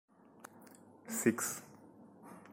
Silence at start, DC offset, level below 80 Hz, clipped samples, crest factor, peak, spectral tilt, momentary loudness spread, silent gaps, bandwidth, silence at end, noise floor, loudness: 0.4 s; under 0.1%; -80 dBFS; under 0.1%; 26 dB; -16 dBFS; -4 dB/octave; 25 LU; none; 16.5 kHz; 0 s; -59 dBFS; -36 LUFS